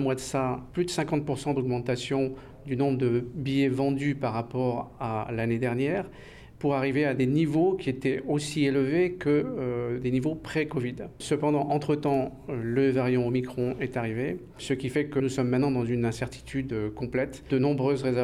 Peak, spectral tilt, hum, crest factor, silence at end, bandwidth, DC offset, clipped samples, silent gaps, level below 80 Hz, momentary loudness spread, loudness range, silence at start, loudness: -16 dBFS; -7 dB/octave; none; 12 dB; 0 s; 13 kHz; under 0.1%; under 0.1%; none; -54 dBFS; 7 LU; 3 LU; 0 s; -28 LUFS